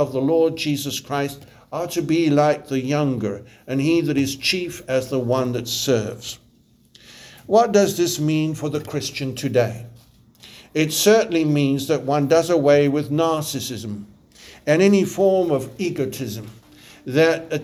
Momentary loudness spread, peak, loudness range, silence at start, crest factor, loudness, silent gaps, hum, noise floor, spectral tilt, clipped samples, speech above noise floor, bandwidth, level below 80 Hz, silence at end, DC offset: 14 LU; -2 dBFS; 4 LU; 0 s; 18 dB; -20 LUFS; none; none; -56 dBFS; -5 dB/octave; under 0.1%; 36 dB; over 20 kHz; -58 dBFS; 0 s; under 0.1%